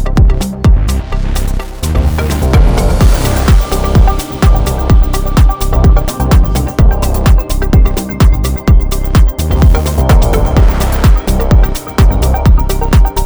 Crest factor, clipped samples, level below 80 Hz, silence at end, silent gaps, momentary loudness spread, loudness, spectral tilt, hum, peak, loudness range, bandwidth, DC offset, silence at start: 8 dB; 0.5%; -10 dBFS; 0 s; none; 4 LU; -11 LUFS; -6.5 dB/octave; none; 0 dBFS; 1 LU; over 20 kHz; under 0.1%; 0 s